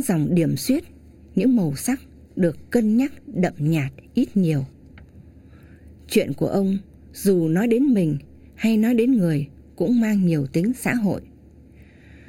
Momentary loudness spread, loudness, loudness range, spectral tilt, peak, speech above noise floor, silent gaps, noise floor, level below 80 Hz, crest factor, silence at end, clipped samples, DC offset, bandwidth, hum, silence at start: 8 LU; -22 LUFS; 4 LU; -7 dB/octave; -6 dBFS; 27 dB; none; -47 dBFS; -50 dBFS; 16 dB; 1.05 s; under 0.1%; under 0.1%; 17 kHz; none; 0 s